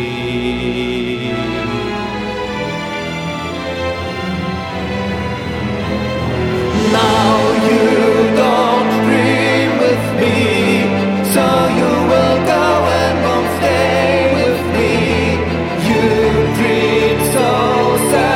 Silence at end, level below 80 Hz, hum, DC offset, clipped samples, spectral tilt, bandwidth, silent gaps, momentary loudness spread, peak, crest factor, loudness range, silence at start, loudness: 0 s; -34 dBFS; none; under 0.1%; under 0.1%; -5.5 dB/octave; 17 kHz; none; 8 LU; 0 dBFS; 14 dB; 8 LU; 0 s; -14 LUFS